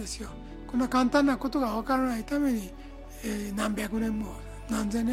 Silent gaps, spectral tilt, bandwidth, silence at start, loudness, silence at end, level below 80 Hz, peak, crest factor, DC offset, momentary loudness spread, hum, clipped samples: none; -5 dB/octave; 16 kHz; 0 s; -29 LUFS; 0 s; -44 dBFS; -12 dBFS; 18 dB; under 0.1%; 17 LU; none; under 0.1%